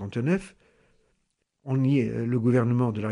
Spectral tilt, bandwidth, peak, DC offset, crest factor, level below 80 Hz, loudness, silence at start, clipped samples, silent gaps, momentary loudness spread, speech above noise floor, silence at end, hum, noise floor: -9 dB/octave; 10.5 kHz; -12 dBFS; under 0.1%; 14 dB; -60 dBFS; -25 LUFS; 0 s; under 0.1%; none; 7 LU; 51 dB; 0 s; none; -75 dBFS